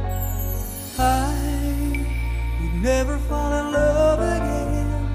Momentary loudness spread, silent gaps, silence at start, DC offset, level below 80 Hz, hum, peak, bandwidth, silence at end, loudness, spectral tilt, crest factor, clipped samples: 7 LU; none; 0 s; under 0.1%; -26 dBFS; none; -8 dBFS; 15.5 kHz; 0 s; -23 LUFS; -6 dB/octave; 14 dB; under 0.1%